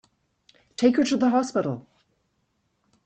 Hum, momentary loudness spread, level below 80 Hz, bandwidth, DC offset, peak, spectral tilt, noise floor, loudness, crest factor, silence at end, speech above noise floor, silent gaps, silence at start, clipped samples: none; 15 LU; -66 dBFS; 8.8 kHz; under 0.1%; -6 dBFS; -5.5 dB/octave; -72 dBFS; -23 LUFS; 20 dB; 1.25 s; 50 dB; none; 0.8 s; under 0.1%